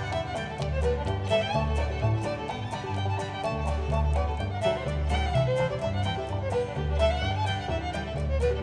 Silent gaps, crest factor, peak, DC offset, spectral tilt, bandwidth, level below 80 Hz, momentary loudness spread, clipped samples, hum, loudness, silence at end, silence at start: none; 16 dB; -12 dBFS; under 0.1%; -6.5 dB/octave; 10.5 kHz; -34 dBFS; 6 LU; under 0.1%; none; -29 LUFS; 0 s; 0 s